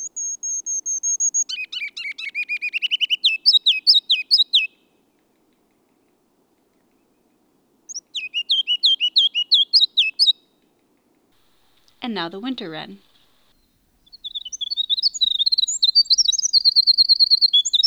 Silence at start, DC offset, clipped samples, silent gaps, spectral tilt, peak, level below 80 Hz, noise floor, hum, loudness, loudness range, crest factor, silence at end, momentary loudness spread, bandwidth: 0 s; under 0.1%; under 0.1%; none; 2 dB/octave; -4 dBFS; -70 dBFS; -63 dBFS; none; -16 LUFS; 17 LU; 18 dB; 0 s; 16 LU; over 20 kHz